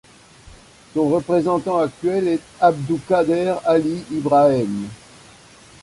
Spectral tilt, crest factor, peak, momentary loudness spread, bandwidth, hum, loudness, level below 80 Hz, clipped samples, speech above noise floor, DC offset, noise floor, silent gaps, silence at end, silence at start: -7 dB/octave; 18 dB; -2 dBFS; 9 LU; 11.5 kHz; none; -19 LUFS; -54 dBFS; under 0.1%; 28 dB; under 0.1%; -46 dBFS; none; 0.85 s; 0.45 s